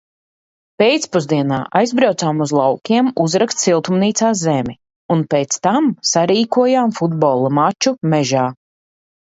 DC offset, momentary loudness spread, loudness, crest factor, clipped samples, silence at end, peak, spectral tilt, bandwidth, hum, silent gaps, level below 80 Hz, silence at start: under 0.1%; 4 LU; -16 LUFS; 16 dB; under 0.1%; 0.8 s; 0 dBFS; -5 dB/octave; 8.2 kHz; none; 4.96-5.09 s; -58 dBFS; 0.8 s